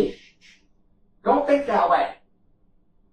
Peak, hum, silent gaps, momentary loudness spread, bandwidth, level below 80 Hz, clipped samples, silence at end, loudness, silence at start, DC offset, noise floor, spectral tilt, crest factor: -6 dBFS; none; none; 9 LU; 9.6 kHz; -54 dBFS; under 0.1%; 1 s; -22 LUFS; 0 s; 0.1%; -61 dBFS; -6 dB/octave; 18 dB